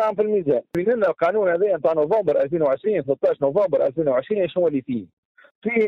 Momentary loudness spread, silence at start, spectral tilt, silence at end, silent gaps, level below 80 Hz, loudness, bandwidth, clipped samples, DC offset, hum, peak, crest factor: 4 LU; 0 s; -8.5 dB/octave; 0 s; 5.13-5.35 s, 5.51-5.62 s; -62 dBFS; -21 LUFS; 6 kHz; under 0.1%; under 0.1%; none; -8 dBFS; 14 dB